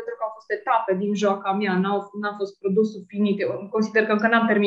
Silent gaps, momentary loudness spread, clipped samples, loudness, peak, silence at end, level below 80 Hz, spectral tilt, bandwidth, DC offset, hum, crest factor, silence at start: none; 9 LU; under 0.1%; -23 LUFS; -4 dBFS; 0 s; -72 dBFS; -6.5 dB/octave; 7.6 kHz; under 0.1%; none; 20 dB; 0 s